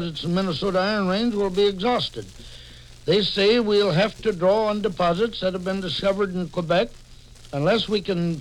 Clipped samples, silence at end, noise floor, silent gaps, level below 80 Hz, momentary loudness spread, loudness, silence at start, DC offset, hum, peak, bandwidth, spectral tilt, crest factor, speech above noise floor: under 0.1%; 0 s; -45 dBFS; none; -46 dBFS; 11 LU; -22 LUFS; 0 s; under 0.1%; none; -6 dBFS; 12 kHz; -6 dB/octave; 16 dB; 23 dB